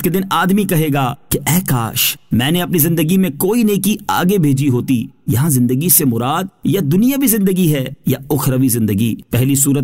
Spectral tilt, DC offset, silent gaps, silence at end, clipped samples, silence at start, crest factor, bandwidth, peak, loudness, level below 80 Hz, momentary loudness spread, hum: -5 dB/octave; 0.5%; none; 0 s; under 0.1%; 0 s; 14 dB; 16.5 kHz; 0 dBFS; -15 LUFS; -44 dBFS; 6 LU; none